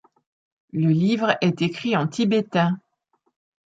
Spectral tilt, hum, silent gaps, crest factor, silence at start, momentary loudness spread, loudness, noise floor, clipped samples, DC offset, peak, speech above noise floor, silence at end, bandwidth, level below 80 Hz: -7 dB/octave; none; none; 20 dB; 0.75 s; 5 LU; -22 LUFS; -70 dBFS; under 0.1%; under 0.1%; -4 dBFS; 50 dB; 0.9 s; 7.8 kHz; -66 dBFS